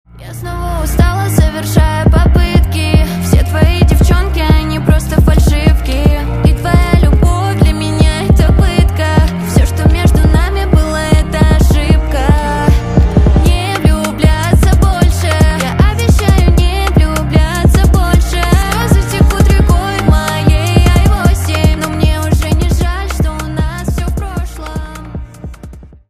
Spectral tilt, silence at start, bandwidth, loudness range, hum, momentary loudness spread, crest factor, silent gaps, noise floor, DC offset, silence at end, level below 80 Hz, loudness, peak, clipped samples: -6 dB/octave; 0.15 s; 15.5 kHz; 2 LU; none; 8 LU; 10 dB; none; -32 dBFS; under 0.1%; 0.2 s; -12 dBFS; -11 LUFS; 0 dBFS; under 0.1%